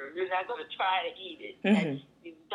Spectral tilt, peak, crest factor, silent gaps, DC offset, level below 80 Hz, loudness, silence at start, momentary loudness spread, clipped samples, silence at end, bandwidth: -6.5 dB/octave; -12 dBFS; 20 dB; none; under 0.1%; -78 dBFS; -31 LUFS; 0 s; 15 LU; under 0.1%; 0 s; 10 kHz